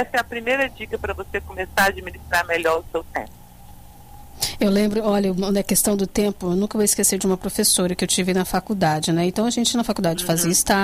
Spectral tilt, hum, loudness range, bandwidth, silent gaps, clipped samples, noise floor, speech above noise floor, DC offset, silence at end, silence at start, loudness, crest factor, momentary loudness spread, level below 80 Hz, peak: -3.5 dB/octave; none; 5 LU; 16 kHz; none; under 0.1%; -42 dBFS; 21 dB; under 0.1%; 0 s; 0 s; -21 LUFS; 16 dB; 10 LU; -42 dBFS; -6 dBFS